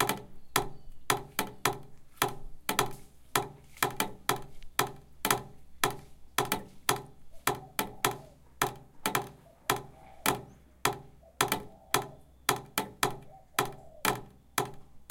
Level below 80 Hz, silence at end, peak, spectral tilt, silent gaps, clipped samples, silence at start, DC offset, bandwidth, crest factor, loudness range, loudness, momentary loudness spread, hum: -54 dBFS; 0.05 s; -6 dBFS; -2.5 dB/octave; none; under 0.1%; 0 s; under 0.1%; 17 kHz; 28 dB; 1 LU; -33 LUFS; 9 LU; none